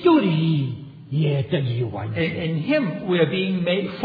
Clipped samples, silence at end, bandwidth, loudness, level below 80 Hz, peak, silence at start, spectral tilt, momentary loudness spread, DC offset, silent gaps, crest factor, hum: under 0.1%; 0 s; 5 kHz; -22 LUFS; -58 dBFS; -4 dBFS; 0 s; -10 dB/octave; 7 LU; under 0.1%; none; 18 dB; none